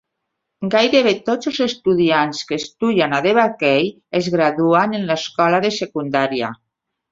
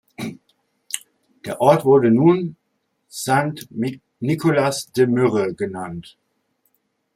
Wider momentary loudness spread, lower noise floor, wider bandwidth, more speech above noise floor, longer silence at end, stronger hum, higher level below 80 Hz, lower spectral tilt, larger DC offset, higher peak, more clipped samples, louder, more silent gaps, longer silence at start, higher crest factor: second, 7 LU vs 18 LU; first, -77 dBFS vs -71 dBFS; second, 7.8 kHz vs 16 kHz; first, 60 dB vs 53 dB; second, 0.6 s vs 1.15 s; neither; about the same, -60 dBFS vs -62 dBFS; about the same, -5 dB/octave vs -6 dB/octave; neither; about the same, -2 dBFS vs -2 dBFS; neither; about the same, -17 LUFS vs -19 LUFS; neither; first, 0.6 s vs 0.2 s; about the same, 16 dB vs 20 dB